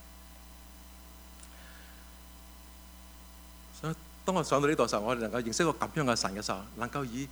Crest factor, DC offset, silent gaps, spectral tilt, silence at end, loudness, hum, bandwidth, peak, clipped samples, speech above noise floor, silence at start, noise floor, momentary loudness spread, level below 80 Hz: 22 dB; under 0.1%; none; -4.5 dB/octave; 0 s; -31 LUFS; none; over 20 kHz; -12 dBFS; under 0.1%; 20 dB; 0 s; -51 dBFS; 23 LU; -54 dBFS